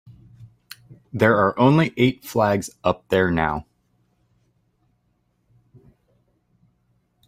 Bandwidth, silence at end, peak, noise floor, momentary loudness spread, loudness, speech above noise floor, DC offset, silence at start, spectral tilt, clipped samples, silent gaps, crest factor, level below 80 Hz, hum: 16 kHz; 3.65 s; -4 dBFS; -68 dBFS; 25 LU; -20 LUFS; 49 dB; under 0.1%; 0.4 s; -6.5 dB/octave; under 0.1%; none; 20 dB; -52 dBFS; none